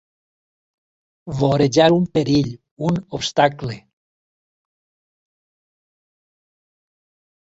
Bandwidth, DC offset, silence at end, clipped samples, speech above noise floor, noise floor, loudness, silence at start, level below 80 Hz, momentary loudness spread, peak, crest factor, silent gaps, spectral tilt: 8 kHz; under 0.1%; 3.65 s; under 0.1%; over 72 dB; under -90 dBFS; -18 LUFS; 1.25 s; -52 dBFS; 16 LU; -2 dBFS; 22 dB; 2.71-2.77 s; -6 dB/octave